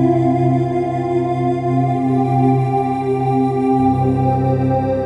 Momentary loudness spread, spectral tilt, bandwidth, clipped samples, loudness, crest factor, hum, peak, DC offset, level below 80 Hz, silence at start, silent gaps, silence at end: 3 LU; -10 dB/octave; 7.6 kHz; under 0.1%; -17 LUFS; 12 dB; none; -4 dBFS; under 0.1%; -42 dBFS; 0 s; none; 0 s